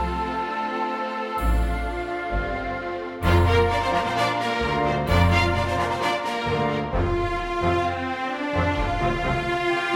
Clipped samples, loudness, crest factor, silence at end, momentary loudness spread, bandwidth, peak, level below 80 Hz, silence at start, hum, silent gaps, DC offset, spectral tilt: under 0.1%; -24 LUFS; 16 dB; 0 s; 8 LU; 16.5 kHz; -6 dBFS; -32 dBFS; 0 s; none; none; under 0.1%; -6 dB/octave